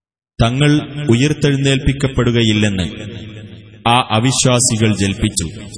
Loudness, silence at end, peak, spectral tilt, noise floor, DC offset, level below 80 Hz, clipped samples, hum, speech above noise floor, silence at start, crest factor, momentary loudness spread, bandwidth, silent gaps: -15 LUFS; 0 s; 0 dBFS; -4.5 dB/octave; -35 dBFS; under 0.1%; -34 dBFS; under 0.1%; none; 20 dB; 0.4 s; 16 dB; 11 LU; 11 kHz; none